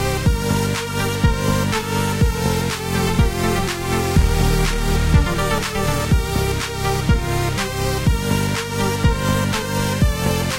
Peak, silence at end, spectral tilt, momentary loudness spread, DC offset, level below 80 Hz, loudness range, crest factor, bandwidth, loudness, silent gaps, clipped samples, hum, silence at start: -2 dBFS; 0 s; -5 dB/octave; 4 LU; under 0.1%; -24 dBFS; 1 LU; 16 dB; 16 kHz; -19 LUFS; none; under 0.1%; none; 0 s